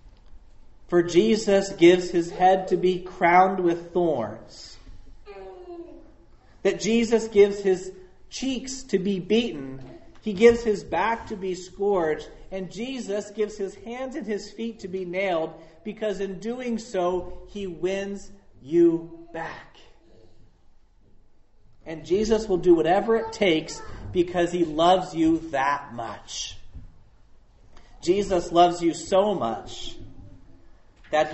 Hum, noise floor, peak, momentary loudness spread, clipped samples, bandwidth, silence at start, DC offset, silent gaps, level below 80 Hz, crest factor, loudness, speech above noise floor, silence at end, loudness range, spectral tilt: none; -53 dBFS; -4 dBFS; 18 LU; under 0.1%; 8.2 kHz; 0.05 s; under 0.1%; none; -48 dBFS; 22 dB; -24 LUFS; 30 dB; 0 s; 9 LU; -5 dB/octave